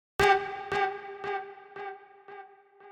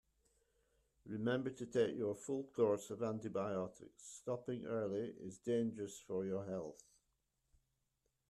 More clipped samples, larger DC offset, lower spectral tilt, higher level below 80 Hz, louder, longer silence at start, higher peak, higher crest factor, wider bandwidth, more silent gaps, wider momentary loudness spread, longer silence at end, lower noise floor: neither; neither; second, -3.5 dB/octave vs -6 dB/octave; first, -56 dBFS vs -78 dBFS; first, -29 LUFS vs -42 LUFS; second, 0.2 s vs 1.05 s; first, -10 dBFS vs -24 dBFS; about the same, 22 dB vs 20 dB; first, 15.5 kHz vs 12.5 kHz; neither; first, 24 LU vs 12 LU; second, 0 s vs 1.55 s; second, -53 dBFS vs -85 dBFS